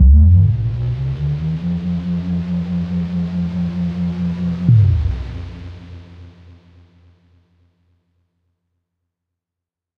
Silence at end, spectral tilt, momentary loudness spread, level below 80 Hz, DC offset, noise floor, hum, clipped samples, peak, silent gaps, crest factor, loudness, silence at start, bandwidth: 3.7 s; -10 dB/octave; 18 LU; -22 dBFS; under 0.1%; -85 dBFS; none; under 0.1%; -2 dBFS; none; 16 dB; -18 LUFS; 0 s; 5.4 kHz